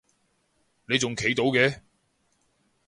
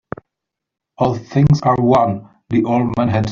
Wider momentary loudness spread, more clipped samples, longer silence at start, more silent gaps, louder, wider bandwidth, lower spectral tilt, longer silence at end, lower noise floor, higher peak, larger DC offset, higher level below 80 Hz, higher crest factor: second, 5 LU vs 12 LU; neither; about the same, 0.9 s vs 1 s; neither; second, -24 LUFS vs -16 LUFS; first, 11.5 kHz vs 7.2 kHz; second, -4 dB/octave vs -8.5 dB/octave; first, 1.1 s vs 0 s; second, -70 dBFS vs -82 dBFS; second, -6 dBFS vs 0 dBFS; neither; second, -60 dBFS vs -42 dBFS; first, 22 dB vs 16 dB